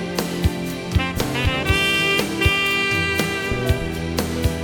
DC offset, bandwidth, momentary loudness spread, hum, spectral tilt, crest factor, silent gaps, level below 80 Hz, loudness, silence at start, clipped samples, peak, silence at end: under 0.1%; over 20 kHz; 7 LU; none; -4.5 dB/octave; 18 dB; none; -30 dBFS; -20 LUFS; 0 s; under 0.1%; -2 dBFS; 0 s